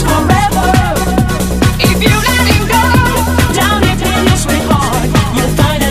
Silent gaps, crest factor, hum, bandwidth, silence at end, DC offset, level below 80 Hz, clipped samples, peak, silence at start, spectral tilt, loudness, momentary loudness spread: none; 10 dB; none; 16 kHz; 0 s; 1%; -20 dBFS; 0.1%; 0 dBFS; 0 s; -4.5 dB/octave; -11 LUFS; 3 LU